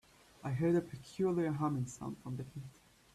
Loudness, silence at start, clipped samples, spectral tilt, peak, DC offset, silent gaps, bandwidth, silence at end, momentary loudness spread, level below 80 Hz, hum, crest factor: -37 LUFS; 0.45 s; under 0.1%; -7.5 dB/octave; -22 dBFS; under 0.1%; none; 13.5 kHz; 0.45 s; 15 LU; -68 dBFS; none; 16 dB